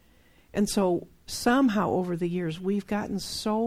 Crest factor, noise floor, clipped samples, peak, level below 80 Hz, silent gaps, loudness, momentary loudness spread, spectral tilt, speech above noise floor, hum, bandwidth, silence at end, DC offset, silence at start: 14 dB; -60 dBFS; under 0.1%; -12 dBFS; -52 dBFS; none; -27 LUFS; 9 LU; -5 dB/octave; 33 dB; none; 16 kHz; 0 s; under 0.1%; 0.55 s